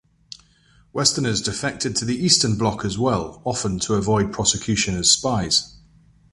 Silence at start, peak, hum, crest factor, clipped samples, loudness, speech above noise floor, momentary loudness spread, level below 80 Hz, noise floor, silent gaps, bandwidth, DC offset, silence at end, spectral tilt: 0.3 s; -2 dBFS; none; 20 dB; under 0.1%; -20 LUFS; 35 dB; 9 LU; -44 dBFS; -56 dBFS; none; 11.5 kHz; under 0.1%; 0.55 s; -3 dB/octave